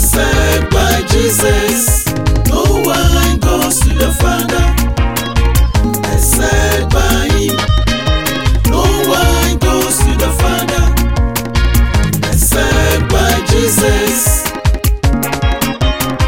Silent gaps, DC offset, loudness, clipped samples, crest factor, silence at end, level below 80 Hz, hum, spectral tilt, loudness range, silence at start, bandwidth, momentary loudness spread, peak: none; 2%; -12 LUFS; under 0.1%; 12 dB; 0 s; -14 dBFS; none; -4 dB/octave; 1 LU; 0 s; 17 kHz; 4 LU; 0 dBFS